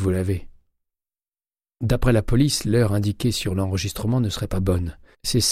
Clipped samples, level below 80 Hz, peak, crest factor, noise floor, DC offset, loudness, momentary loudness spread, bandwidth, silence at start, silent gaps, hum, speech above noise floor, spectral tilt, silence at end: under 0.1%; -34 dBFS; -6 dBFS; 16 dB; under -90 dBFS; under 0.1%; -22 LUFS; 8 LU; 16 kHz; 0 s; none; none; over 69 dB; -5.5 dB/octave; 0 s